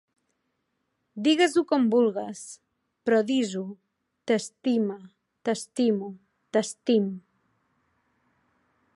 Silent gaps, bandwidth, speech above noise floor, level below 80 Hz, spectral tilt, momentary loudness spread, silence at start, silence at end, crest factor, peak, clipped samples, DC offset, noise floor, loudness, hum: none; 11.5 kHz; 52 dB; -78 dBFS; -4.5 dB/octave; 19 LU; 1.15 s; 1.75 s; 18 dB; -10 dBFS; under 0.1%; under 0.1%; -77 dBFS; -26 LUFS; none